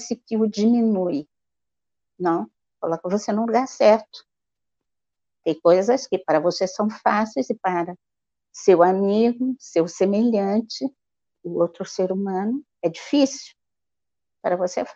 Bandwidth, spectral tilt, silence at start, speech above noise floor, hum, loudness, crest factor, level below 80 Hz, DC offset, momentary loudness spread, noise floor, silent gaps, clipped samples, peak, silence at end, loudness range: 7.8 kHz; -5.5 dB/octave; 0 s; 68 dB; none; -22 LUFS; 18 dB; -70 dBFS; under 0.1%; 12 LU; -89 dBFS; none; under 0.1%; -4 dBFS; 0.05 s; 4 LU